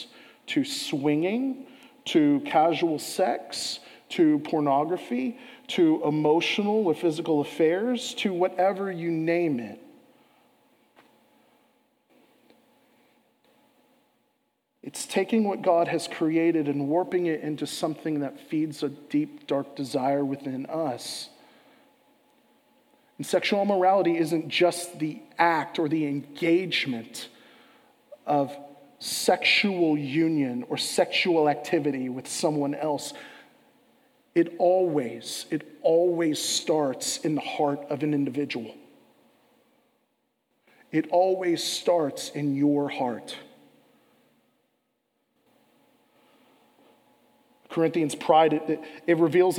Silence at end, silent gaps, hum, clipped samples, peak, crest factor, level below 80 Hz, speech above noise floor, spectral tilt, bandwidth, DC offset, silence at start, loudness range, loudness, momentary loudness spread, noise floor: 0 s; none; none; under 0.1%; -6 dBFS; 22 dB; -84 dBFS; 50 dB; -4.5 dB/octave; 16.5 kHz; under 0.1%; 0 s; 7 LU; -26 LUFS; 11 LU; -75 dBFS